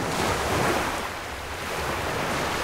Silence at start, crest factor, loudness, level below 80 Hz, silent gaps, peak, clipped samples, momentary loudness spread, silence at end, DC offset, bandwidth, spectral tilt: 0 s; 14 dB; -27 LUFS; -42 dBFS; none; -12 dBFS; under 0.1%; 8 LU; 0 s; under 0.1%; 16 kHz; -3.5 dB/octave